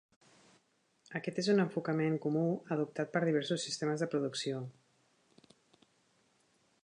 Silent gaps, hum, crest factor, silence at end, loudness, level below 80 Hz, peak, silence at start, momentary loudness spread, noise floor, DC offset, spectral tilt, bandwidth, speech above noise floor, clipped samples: none; none; 18 dB; 2.1 s; -34 LUFS; -84 dBFS; -18 dBFS; 1.1 s; 9 LU; -74 dBFS; under 0.1%; -5.5 dB/octave; 10.5 kHz; 40 dB; under 0.1%